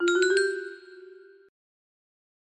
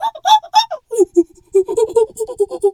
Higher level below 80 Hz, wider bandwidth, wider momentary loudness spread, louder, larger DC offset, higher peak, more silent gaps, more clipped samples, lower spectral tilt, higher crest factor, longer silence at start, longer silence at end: second, -76 dBFS vs -56 dBFS; second, 8.8 kHz vs 15.5 kHz; first, 26 LU vs 8 LU; second, -25 LUFS vs -16 LUFS; neither; second, -10 dBFS vs 0 dBFS; neither; neither; second, -1 dB/octave vs -2.5 dB/octave; about the same, 20 dB vs 16 dB; about the same, 0 s vs 0 s; first, 1.35 s vs 0 s